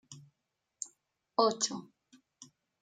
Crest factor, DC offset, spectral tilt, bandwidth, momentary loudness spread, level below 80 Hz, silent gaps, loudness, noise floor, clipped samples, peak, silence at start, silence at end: 26 dB; under 0.1%; -2.5 dB/octave; 9.6 kHz; 25 LU; -86 dBFS; none; -33 LUFS; -85 dBFS; under 0.1%; -12 dBFS; 0.1 s; 0.4 s